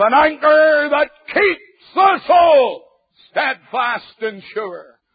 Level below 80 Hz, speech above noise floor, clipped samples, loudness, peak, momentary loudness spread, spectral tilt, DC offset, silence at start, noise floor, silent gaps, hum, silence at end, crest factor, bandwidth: -56 dBFS; 38 dB; under 0.1%; -15 LUFS; -2 dBFS; 15 LU; -8.5 dB/octave; under 0.1%; 0 s; -53 dBFS; none; none; 0.3 s; 14 dB; 5 kHz